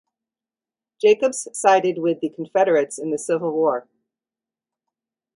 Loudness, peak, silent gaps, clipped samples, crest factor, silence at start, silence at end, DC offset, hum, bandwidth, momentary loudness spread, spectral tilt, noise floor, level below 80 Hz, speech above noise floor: -20 LUFS; -2 dBFS; none; under 0.1%; 20 dB; 1.05 s; 1.55 s; under 0.1%; none; 11.5 kHz; 8 LU; -4 dB/octave; under -90 dBFS; -74 dBFS; over 70 dB